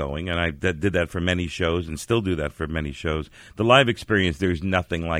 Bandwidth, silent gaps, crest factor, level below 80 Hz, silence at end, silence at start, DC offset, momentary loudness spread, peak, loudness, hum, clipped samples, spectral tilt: 15.5 kHz; none; 20 dB; -40 dBFS; 0 s; 0 s; under 0.1%; 11 LU; -2 dBFS; -23 LUFS; none; under 0.1%; -5.5 dB/octave